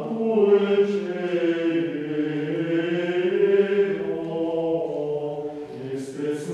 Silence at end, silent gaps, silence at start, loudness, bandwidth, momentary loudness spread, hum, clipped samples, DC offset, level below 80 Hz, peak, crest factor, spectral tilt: 0 s; none; 0 s; -24 LUFS; 10.5 kHz; 11 LU; none; under 0.1%; under 0.1%; -68 dBFS; -8 dBFS; 16 dB; -7 dB/octave